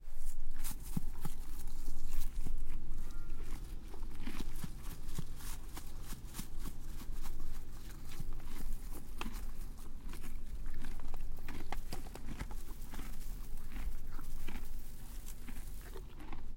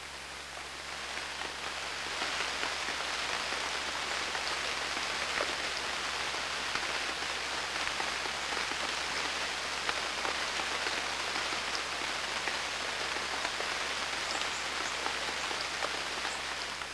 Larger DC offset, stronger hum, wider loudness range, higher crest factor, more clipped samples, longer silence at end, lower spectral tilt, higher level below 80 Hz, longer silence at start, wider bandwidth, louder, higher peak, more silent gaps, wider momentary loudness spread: neither; neither; about the same, 3 LU vs 1 LU; second, 14 dB vs 22 dB; neither; about the same, 0 s vs 0 s; first, -4.5 dB/octave vs -0.5 dB/octave; first, -38 dBFS vs -58 dBFS; about the same, 0 s vs 0 s; first, 16 kHz vs 11 kHz; second, -48 LUFS vs -33 LUFS; second, -18 dBFS vs -14 dBFS; neither; about the same, 6 LU vs 4 LU